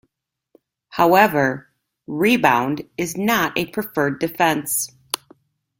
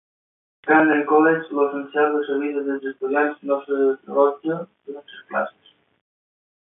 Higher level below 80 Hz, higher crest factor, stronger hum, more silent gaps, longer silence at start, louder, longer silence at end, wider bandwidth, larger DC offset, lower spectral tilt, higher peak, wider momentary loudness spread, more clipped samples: first, -58 dBFS vs -78 dBFS; about the same, 20 dB vs 20 dB; neither; neither; first, 0.9 s vs 0.65 s; about the same, -19 LUFS vs -21 LUFS; second, 0.65 s vs 1.15 s; first, 17 kHz vs 3.8 kHz; neither; second, -4 dB/octave vs -10.5 dB/octave; about the same, 0 dBFS vs -2 dBFS; about the same, 14 LU vs 14 LU; neither